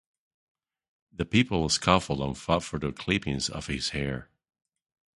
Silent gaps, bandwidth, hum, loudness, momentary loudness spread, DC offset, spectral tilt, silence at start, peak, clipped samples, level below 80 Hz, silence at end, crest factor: none; 11.5 kHz; none; -27 LUFS; 10 LU; under 0.1%; -4.5 dB/octave; 1.2 s; -4 dBFS; under 0.1%; -46 dBFS; 0.95 s; 26 dB